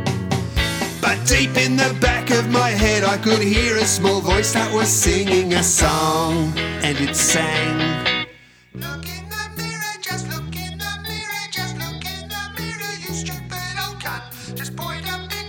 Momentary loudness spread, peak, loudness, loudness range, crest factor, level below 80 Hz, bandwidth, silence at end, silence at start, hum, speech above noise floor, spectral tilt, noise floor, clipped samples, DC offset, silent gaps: 13 LU; -2 dBFS; -19 LUFS; 10 LU; 18 dB; -34 dBFS; 20 kHz; 0 s; 0 s; none; 28 dB; -3.5 dB/octave; -46 dBFS; under 0.1%; under 0.1%; none